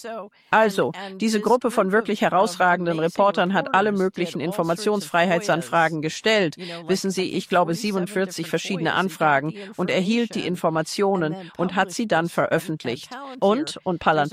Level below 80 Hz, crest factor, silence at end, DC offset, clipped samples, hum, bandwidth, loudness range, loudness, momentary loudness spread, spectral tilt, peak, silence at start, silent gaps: -64 dBFS; 18 dB; 0 s; under 0.1%; under 0.1%; none; 16 kHz; 3 LU; -22 LUFS; 7 LU; -5 dB/octave; -4 dBFS; 0 s; none